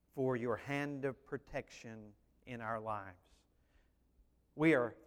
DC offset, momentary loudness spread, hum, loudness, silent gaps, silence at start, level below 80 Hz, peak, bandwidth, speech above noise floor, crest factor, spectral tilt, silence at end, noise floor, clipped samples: under 0.1%; 21 LU; none; -38 LUFS; none; 0.15 s; -68 dBFS; -18 dBFS; 14.5 kHz; 33 dB; 22 dB; -7 dB/octave; 0.05 s; -72 dBFS; under 0.1%